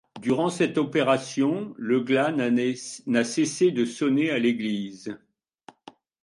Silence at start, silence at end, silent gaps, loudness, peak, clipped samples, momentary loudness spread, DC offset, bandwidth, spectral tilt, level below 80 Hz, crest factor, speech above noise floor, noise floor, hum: 0.15 s; 1.05 s; none; -24 LUFS; -8 dBFS; under 0.1%; 9 LU; under 0.1%; 11.5 kHz; -5 dB/octave; -70 dBFS; 16 dB; 29 dB; -53 dBFS; none